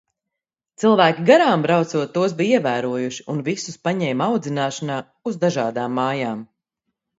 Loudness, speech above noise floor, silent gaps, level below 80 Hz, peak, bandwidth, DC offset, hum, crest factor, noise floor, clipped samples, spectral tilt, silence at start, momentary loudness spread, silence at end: -20 LUFS; 65 dB; none; -68 dBFS; 0 dBFS; 8 kHz; under 0.1%; none; 20 dB; -85 dBFS; under 0.1%; -5.5 dB/octave; 0.8 s; 12 LU; 0.75 s